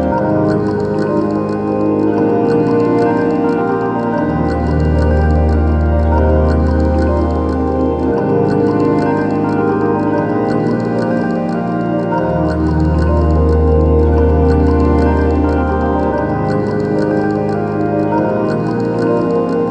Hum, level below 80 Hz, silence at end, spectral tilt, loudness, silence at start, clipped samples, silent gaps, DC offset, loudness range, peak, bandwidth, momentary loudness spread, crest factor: none; -20 dBFS; 0 s; -9.5 dB/octave; -14 LUFS; 0 s; under 0.1%; none; under 0.1%; 3 LU; -2 dBFS; 7.6 kHz; 4 LU; 12 dB